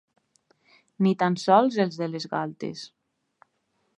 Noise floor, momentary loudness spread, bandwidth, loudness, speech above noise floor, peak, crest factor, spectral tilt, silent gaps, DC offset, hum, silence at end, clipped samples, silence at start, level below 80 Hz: -73 dBFS; 16 LU; 10.5 kHz; -25 LUFS; 49 dB; -4 dBFS; 22 dB; -6.5 dB/octave; none; under 0.1%; none; 1.1 s; under 0.1%; 1 s; -78 dBFS